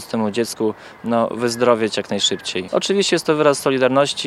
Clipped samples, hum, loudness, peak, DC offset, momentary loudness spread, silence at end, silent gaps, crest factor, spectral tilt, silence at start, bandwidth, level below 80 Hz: under 0.1%; none; -18 LUFS; 0 dBFS; under 0.1%; 6 LU; 0 s; none; 18 dB; -3.5 dB/octave; 0 s; 15 kHz; -64 dBFS